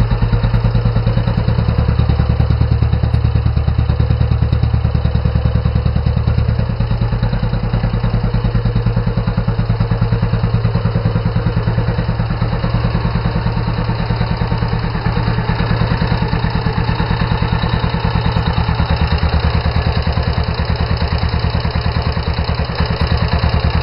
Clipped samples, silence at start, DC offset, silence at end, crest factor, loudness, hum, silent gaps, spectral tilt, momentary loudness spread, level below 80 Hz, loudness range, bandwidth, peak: under 0.1%; 0 s; under 0.1%; 0 s; 12 dB; -16 LUFS; none; none; -10 dB/octave; 3 LU; -20 dBFS; 2 LU; 5.6 kHz; -2 dBFS